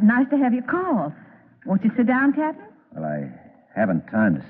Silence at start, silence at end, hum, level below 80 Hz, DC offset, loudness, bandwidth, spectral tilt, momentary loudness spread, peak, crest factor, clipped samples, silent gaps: 0 s; 0 s; none; -64 dBFS; under 0.1%; -22 LUFS; 3.5 kHz; -12 dB/octave; 16 LU; -8 dBFS; 14 dB; under 0.1%; none